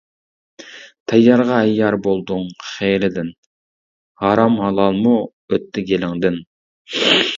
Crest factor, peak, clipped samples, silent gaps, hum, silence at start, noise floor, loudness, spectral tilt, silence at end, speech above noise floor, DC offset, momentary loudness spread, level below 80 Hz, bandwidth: 18 dB; 0 dBFS; under 0.1%; 1.00-1.06 s, 3.38-4.15 s, 5.33-5.48 s, 6.47-6.85 s; none; 0.6 s; under -90 dBFS; -17 LUFS; -5.5 dB/octave; 0 s; over 74 dB; under 0.1%; 15 LU; -52 dBFS; 7.6 kHz